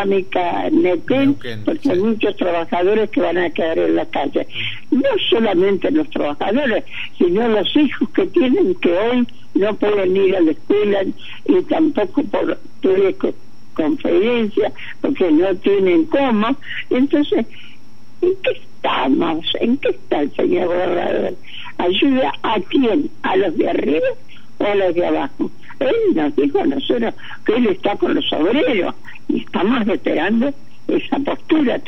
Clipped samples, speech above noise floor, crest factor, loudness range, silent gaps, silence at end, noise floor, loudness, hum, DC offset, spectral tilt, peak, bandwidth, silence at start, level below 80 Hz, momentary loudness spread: under 0.1%; 30 dB; 14 dB; 2 LU; none; 0.1 s; -47 dBFS; -18 LUFS; none; 5%; -7 dB/octave; -2 dBFS; 6.2 kHz; 0 s; -58 dBFS; 7 LU